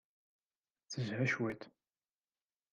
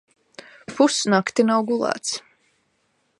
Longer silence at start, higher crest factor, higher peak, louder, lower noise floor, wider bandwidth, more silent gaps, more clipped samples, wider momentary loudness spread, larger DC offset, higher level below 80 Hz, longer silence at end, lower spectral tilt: first, 0.9 s vs 0.7 s; about the same, 20 dB vs 20 dB; second, -24 dBFS vs -4 dBFS; second, -38 LUFS vs -21 LUFS; first, under -90 dBFS vs -68 dBFS; second, 9.4 kHz vs 11.5 kHz; neither; neither; about the same, 15 LU vs 14 LU; neither; second, -78 dBFS vs -72 dBFS; about the same, 1.05 s vs 1 s; first, -5.5 dB/octave vs -3.5 dB/octave